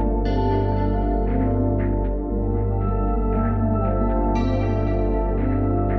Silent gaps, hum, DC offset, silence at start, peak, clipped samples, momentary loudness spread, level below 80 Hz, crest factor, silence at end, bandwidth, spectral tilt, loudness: none; 50 Hz at -40 dBFS; under 0.1%; 0 s; -8 dBFS; under 0.1%; 2 LU; -24 dBFS; 12 dB; 0 s; 5.6 kHz; -10.5 dB/octave; -22 LUFS